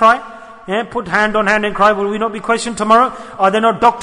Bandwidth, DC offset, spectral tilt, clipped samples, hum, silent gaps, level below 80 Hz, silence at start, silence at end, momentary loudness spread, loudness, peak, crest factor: 11 kHz; under 0.1%; -4 dB/octave; under 0.1%; none; none; -46 dBFS; 0 s; 0 s; 8 LU; -14 LUFS; 0 dBFS; 14 dB